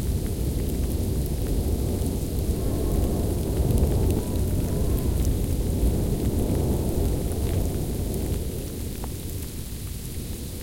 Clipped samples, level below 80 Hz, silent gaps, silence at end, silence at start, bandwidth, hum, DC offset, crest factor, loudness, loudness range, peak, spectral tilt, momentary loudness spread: under 0.1%; -28 dBFS; none; 0 s; 0 s; 17 kHz; none; under 0.1%; 14 dB; -27 LUFS; 4 LU; -10 dBFS; -6.5 dB/octave; 8 LU